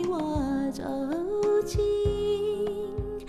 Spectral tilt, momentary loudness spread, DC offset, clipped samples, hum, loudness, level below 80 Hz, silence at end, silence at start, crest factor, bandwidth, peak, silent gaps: -6.5 dB/octave; 6 LU; under 0.1%; under 0.1%; none; -28 LUFS; -42 dBFS; 0 s; 0 s; 12 dB; 13.5 kHz; -14 dBFS; none